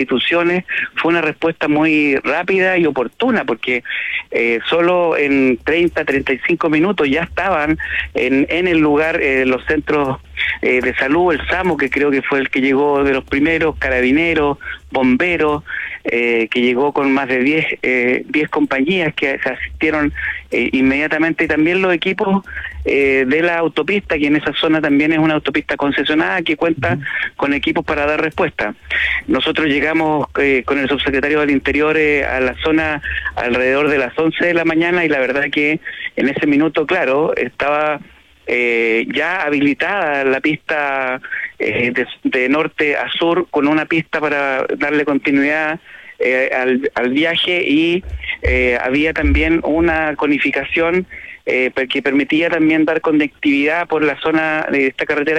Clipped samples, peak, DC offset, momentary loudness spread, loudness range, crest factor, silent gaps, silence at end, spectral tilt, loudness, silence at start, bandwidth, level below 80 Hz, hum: under 0.1%; -4 dBFS; under 0.1%; 5 LU; 2 LU; 12 dB; none; 0 s; -6.5 dB/octave; -16 LUFS; 0 s; 9.6 kHz; -36 dBFS; none